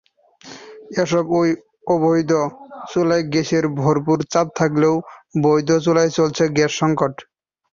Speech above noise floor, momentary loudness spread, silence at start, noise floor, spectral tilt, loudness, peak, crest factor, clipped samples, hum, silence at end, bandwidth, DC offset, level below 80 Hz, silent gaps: 26 dB; 10 LU; 0.45 s; -44 dBFS; -6 dB/octave; -19 LUFS; -2 dBFS; 16 dB; under 0.1%; none; 0.5 s; 7.4 kHz; under 0.1%; -58 dBFS; none